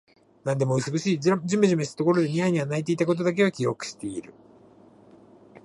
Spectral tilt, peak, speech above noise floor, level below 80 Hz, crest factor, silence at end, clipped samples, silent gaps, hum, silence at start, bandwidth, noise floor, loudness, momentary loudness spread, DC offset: -6 dB/octave; -8 dBFS; 29 dB; -68 dBFS; 18 dB; 0.05 s; under 0.1%; none; none; 0.45 s; 11.5 kHz; -53 dBFS; -25 LUFS; 11 LU; under 0.1%